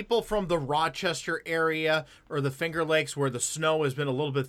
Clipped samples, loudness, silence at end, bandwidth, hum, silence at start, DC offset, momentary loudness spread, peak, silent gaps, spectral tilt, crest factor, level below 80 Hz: under 0.1%; -28 LUFS; 0 s; 16 kHz; none; 0 s; under 0.1%; 4 LU; -12 dBFS; none; -4 dB/octave; 16 dB; -54 dBFS